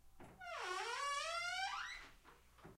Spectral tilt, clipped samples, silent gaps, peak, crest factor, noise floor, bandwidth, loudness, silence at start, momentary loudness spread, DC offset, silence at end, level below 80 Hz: -0.5 dB/octave; under 0.1%; none; -30 dBFS; 16 dB; -65 dBFS; 16 kHz; -43 LUFS; 0.05 s; 19 LU; under 0.1%; 0 s; -70 dBFS